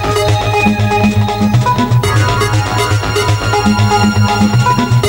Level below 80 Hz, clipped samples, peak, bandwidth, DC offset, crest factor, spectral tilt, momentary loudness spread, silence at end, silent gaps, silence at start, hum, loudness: -28 dBFS; under 0.1%; 0 dBFS; 16.5 kHz; under 0.1%; 12 dB; -5.5 dB/octave; 2 LU; 0 s; none; 0 s; none; -12 LUFS